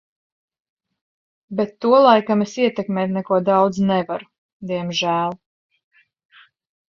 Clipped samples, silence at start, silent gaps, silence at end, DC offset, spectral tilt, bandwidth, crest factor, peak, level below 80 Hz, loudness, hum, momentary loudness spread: under 0.1%; 1.5 s; 4.38-4.60 s; 1.6 s; under 0.1%; -6 dB/octave; 7.4 kHz; 20 dB; 0 dBFS; -64 dBFS; -19 LUFS; none; 14 LU